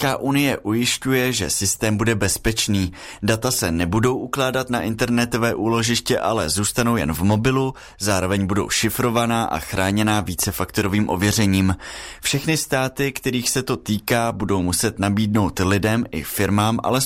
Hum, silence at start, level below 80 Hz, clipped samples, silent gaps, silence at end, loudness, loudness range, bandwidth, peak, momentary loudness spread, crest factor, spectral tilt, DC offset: none; 0 s; -42 dBFS; under 0.1%; none; 0 s; -20 LUFS; 1 LU; 16 kHz; -6 dBFS; 4 LU; 16 dB; -4.5 dB/octave; under 0.1%